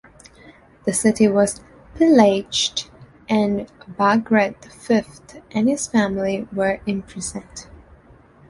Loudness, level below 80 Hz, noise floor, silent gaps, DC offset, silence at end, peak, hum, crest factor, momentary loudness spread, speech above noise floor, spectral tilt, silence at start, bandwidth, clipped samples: -20 LUFS; -50 dBFS; -49 dBFS; none; under 0.1%; 0.85 s; -2 dBFS; none; 18 dB; 19 LU; 30 dB; -4.5 dB/octave; 0.45 s; 11.5 kHz; under 0.1%